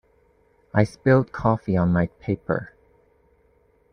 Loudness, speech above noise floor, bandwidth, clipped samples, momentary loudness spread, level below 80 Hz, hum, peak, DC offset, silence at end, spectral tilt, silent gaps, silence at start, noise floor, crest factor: -23 LUFS; 40 dB; 10 kHz; under 0.1%; 9 LU; -50 dBFS; none; -6 dBFS; under 0.1%; 1.25 s; -9 dB/octave; none; 0.75 s; -61 dBFS; 20 dB